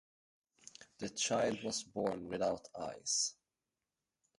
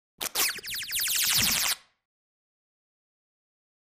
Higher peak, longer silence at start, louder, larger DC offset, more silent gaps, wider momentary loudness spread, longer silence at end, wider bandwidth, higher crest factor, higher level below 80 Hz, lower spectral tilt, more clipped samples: second, -22 dBFS vs -8 dBFS; first, 0.8 s vs 0.2 s; second, -38 LUFS vs -25 LUFS; neither; neither; first, 14 LU vs 10 LU; second, 1.05 s vs 2.05 s; second, 11.5 kHz vs 15.5 kHz; second, 18 dB vs 24 dB; second, -72 dBFS vs -58 dBFS; first, -2.5 dB/octave vs 0.5 dB/octave; neither